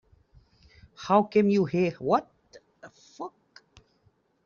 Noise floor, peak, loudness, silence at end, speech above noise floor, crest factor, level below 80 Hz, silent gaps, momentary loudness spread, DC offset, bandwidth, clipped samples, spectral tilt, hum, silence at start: -68 dBFS; -8 dBFS; -25 LUFS; 1.2 s; 44 dB; 22 dB; -66 dBFS; none; 19 LU; under 0.1%; 7.2 kHz; under 0.1%; -6.5 dB/octave; none; 1 s